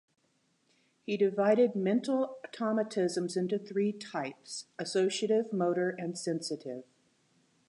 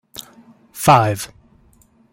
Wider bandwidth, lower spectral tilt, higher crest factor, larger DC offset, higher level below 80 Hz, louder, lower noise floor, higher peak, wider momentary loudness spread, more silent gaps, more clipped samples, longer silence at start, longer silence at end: second, 11.5 kHz vs 16.5 kHz; about the same, -5 dB/octave vs -5 dB/octave; about the same, 18 dB vs 20 dB; neither; second, -86 dBFS vs -54 dBFS; second, -32 LUFS vs -16 LUFS; first, -74 dBFS vs -54 dBFS; second, -14 dBFS vs 0 dBFS; second, 12 LU vs 23 LU; neither; neither; first, 1.1 s vs 0.2 s; about the same, 0.85 s vs 0.85 s